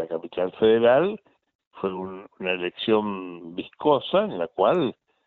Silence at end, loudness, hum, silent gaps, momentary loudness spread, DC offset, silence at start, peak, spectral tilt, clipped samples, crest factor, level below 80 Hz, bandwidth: 0.35 s; -24 LUFS; none; 1.55-1.59 s, 1.67-1.71 s; 16 LU; under 0.1%; 0 s; -6 dBFS; -4 dB/octave; under 0.1%; 18 dB; -64 dBFS; 4.3 kHz